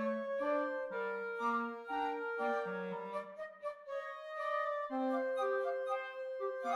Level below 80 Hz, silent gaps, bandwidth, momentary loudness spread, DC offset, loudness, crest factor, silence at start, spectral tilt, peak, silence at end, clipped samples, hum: -84 dBFS; none; 11.5 kHz; 8 LU; under 0.1%; -39 LUFS; 14 dB; 0 s; -6 dB/octave; -24 dBFS; 0 s; under 0.1%; none